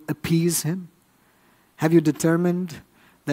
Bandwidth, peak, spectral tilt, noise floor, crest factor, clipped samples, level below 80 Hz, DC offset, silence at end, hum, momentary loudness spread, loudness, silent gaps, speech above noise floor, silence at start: 16 kHz; -4 dBFS; -6 dB/octave; -60 dBFS; 20 dB; under 0.1%; -60 dBFS; under 0.1%; 0 s; none; 15 LU; -22 LUFS; none; 39 dB; 0.1 s